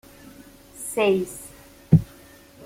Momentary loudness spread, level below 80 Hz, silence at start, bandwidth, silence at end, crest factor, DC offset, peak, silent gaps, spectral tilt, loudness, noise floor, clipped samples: 21 LU; -48 dBFS; 0.8 s; 16 kHz; 0.6 s; 22 dB; under 0.1%; -4 dBFS; none; -6.5 dB/octave; -22 LUFS; -49 dBFS; under 0.1%